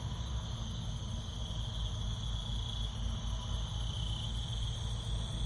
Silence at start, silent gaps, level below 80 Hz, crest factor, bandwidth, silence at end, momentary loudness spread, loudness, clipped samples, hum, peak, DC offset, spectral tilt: 0 s; none; -40 dBFS; 12 dB; 11.5 kHz; 0 s; 3 LU; -39 LUFS; under 0.1%; none; -24 dBFS; under 0.1%; -4.5 dB/octave